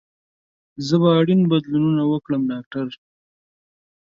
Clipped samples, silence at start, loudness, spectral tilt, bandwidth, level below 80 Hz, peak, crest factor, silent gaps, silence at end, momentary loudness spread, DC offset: under 0.1%; 0.8 s; -19 LUFS; -8 dB/octave; 7.4 kHz; -62 dBFS; -6 dBFS; 16 dB; 2.66-2.71 s; 1.2 s; 13 LU; under 0.1%